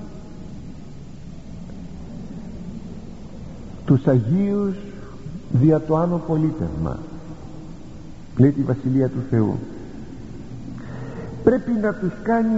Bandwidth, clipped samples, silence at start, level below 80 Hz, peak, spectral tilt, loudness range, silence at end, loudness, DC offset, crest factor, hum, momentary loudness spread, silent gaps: 8 kHz; under 0.1%; 0 s; -42 dBFS; -2 dBFS; -9.5 dB/octave; 12 LU; 0 s; -21 LUFS; under 0.1%; 20 dB; none; 21 LU; none